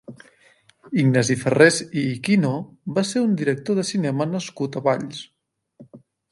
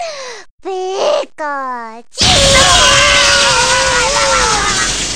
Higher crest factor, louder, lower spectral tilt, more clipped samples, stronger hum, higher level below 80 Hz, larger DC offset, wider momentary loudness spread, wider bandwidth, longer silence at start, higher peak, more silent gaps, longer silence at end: first, 22 dB vs 12 dB; second, -21 LUFS vs -9 LUFS; first, -5.5 dB/octave vs -1 dB/octave; neither; neither; second, -64 dBFS vs -28 dBFS; second, under 0.1% vs 1%; second, 11 LU vs 18 LU; second, 11.5 kHz vs 16.5 kHz; about the same, 0.1 s vs 0 s; about the same, 0 dBFS vs 0 dBFS; second, none vs 0.51-0.58 s; first, 0.35 s vs 0 s